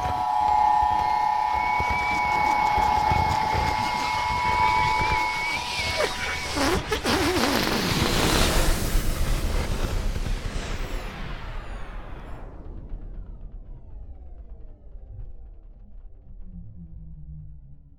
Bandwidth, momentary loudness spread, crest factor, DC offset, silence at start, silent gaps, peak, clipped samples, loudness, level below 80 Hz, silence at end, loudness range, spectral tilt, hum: 19 kHz; 23 LU; 20 dB; under 0.1%; 0 s; none; -4 dBFS; under 0.1%; -24 LUFS; -32 dBFS; 0.1 s; 21 LU; -4 dB/octave; none